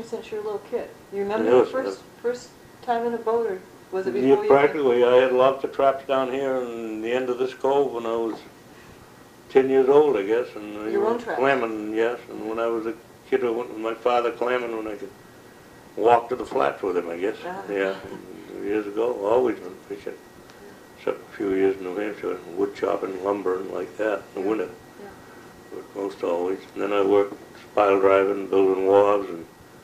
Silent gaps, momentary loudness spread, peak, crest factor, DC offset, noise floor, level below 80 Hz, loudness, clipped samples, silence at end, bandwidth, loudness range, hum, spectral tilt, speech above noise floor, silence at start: none; 17 LU; -4 dBFS; 20 dB; under 0.1%; -48 dBFS; -64 dBFS; -23 LUFS; under 0.1%; 0.05 s; 15 kHz; 7 LU; none; -6 dB/octave; 25 dB; 0 s